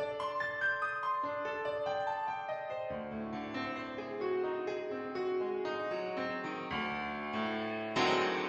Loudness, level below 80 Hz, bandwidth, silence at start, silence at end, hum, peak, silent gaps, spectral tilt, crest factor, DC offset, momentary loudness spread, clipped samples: -36 LUFS; -68 dBFS; 8.4 kHz; 0 s; 0 s; none; -18 dBFS; none; -5 dB/octave; 18 dB; under 0.1%; 7 LU; under 0.1%